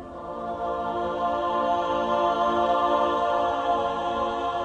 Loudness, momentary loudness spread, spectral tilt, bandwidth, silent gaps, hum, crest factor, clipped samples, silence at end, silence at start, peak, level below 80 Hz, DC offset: -25 LUFS; 7 LU; -5.5 dB/octave; 9.2 kHz; none; none; 14 dB; under 0.1%; 0 s; 0 s; -10 dBFS; -52 dBFS; under 0.1%